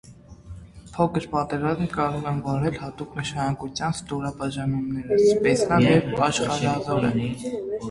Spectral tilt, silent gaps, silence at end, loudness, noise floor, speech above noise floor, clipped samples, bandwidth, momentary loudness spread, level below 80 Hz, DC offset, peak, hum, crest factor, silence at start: -6 dB/octave; none; 0 s; -24 LUFS; -43 dBFS; 20 dB; under 0.1%; 11.5 kHz; 12 LU; -48 dBFS; under 0.1%; -6 dBFS; none; 18 dB; 0.05 s